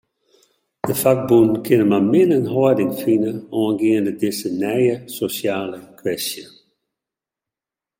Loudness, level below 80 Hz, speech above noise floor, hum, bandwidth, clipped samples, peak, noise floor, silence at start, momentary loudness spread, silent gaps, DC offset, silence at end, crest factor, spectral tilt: -18 LUFS; -60 dBFS; 71 dB; none; 17 kHz; under 0.1%; -2 dBFS; -88 dBFS; 0.85 s; 11 LU; none; under 0.1%; 1.55 s; 16 dB; -6 dB/octave